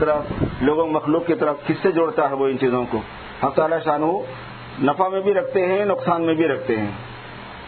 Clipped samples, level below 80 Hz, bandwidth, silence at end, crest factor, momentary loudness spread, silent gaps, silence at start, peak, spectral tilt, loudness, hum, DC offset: under 0.1%; -46 dBFS; 4.5 kHz; 0 s; 16 dB; 13 LU; none; 0 s; -4 dBFS; -11 dB/octave; -21 LUFS; none; under 0.1%